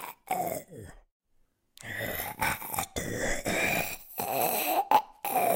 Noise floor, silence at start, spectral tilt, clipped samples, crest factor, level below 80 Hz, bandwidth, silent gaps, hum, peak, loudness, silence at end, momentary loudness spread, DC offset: -69 dBFS; 0 s; -3 dB/octave; under 0.1%; 22 dB; -50 dBFS; 17 kHz; 1.11-1.20 s; none; -8 dBFS; -30 LUFS; 0 s; 11 LU; under 0.1%